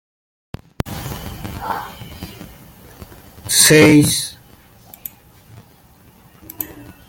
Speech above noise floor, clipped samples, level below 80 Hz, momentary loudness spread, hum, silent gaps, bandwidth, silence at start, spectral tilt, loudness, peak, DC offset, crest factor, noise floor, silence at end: 36 dB; under 0.1%; -44 dBFS; 28 LU; none; none; 17 kHz; 0.85 s; -3.5 dB/octave; -14 LUFS; 0 dBFS; under 0.1%; 20 dB; -48 dBFS; 0.25 s